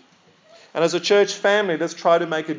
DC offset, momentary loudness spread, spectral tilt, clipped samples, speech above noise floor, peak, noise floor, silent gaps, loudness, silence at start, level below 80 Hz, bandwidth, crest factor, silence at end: under 0.1%; 6 LU; -3.5 dB/octave; under 0.1%; 36 dB; -6 dBFS; -55 dBFS; none; -19 LUFS; 0.75 s; -88 dBFS; 7.6 kHz; 16 dB; 0 s